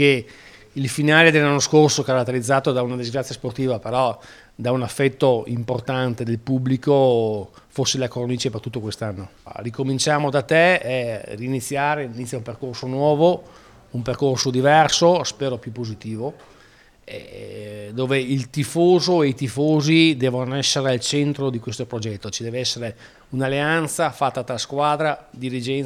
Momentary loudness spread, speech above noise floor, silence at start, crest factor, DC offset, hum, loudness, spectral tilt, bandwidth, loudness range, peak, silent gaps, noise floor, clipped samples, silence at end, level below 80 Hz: 15 LU; 31 dB; 0 s; 20 dB; under 0.1%; none; -20 LUFS; -4.5 dB/octave; 15.5 kHz; 5 LU; 0 dBFS; none; -51 dBFS; under 0.1%; 0 s; -56 dBFS